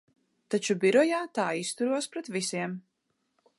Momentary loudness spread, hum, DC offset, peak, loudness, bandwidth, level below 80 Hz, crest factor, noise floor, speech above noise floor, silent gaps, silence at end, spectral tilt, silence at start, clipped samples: 11 LU; none; under 0.1%; -12 dBFS; -28 LUFS; 11.5 kHz; -82 dBFS; 18 dB; -78 dBFS; 50 dB; none; 0.8 s; -4 dB/octave; 0.5 s; under 0.1%